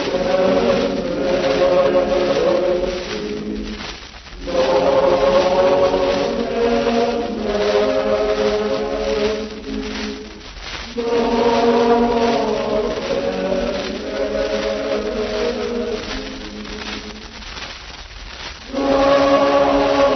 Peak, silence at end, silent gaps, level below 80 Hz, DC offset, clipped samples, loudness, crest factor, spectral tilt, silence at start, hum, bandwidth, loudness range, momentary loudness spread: -2 dBFS; 0 s; none; -38 dBFS; under 0.1%; under 0.1%; -18 LUFS; 16 dB; -5 dB/octave; 0 s; none; 6.4 kHz; 7 LU; 15 LU